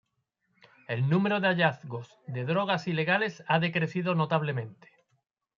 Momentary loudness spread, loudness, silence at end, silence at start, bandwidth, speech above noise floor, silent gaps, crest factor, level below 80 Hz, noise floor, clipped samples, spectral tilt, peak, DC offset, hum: 14 LU; -28 LUFS; 0.85 s; 0.9 s; 7.2 kHz; 50 dB; none; 20 dB; -74 dBFS; -78 dBFS; under 0.1%; -7.5 dB/octave; -10 dBFS; under 0.1%; none